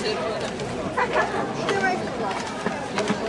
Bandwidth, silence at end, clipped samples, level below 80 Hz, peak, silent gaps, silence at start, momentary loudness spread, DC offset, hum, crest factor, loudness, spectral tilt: 11.5 kHz; 0 s; under 0.1%; -52 dBFS; -10 dBFS; none; 0 s; 6 LU; under 0.1%; none; 16 dB; -25 LUFS; -4.5 dB/octave